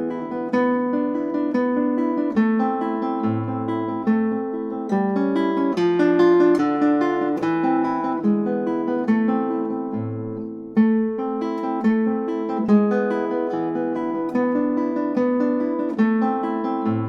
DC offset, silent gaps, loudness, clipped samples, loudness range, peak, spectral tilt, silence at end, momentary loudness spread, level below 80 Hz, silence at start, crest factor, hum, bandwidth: under 0.1%; none; -21 LUFS; under 0.1%; 3 LU; -6 dBFS; -8.5 dB/octave; 0 s; 7 LU; -66 dBFS; 0 s; 14 dB; none; 6.8 kHz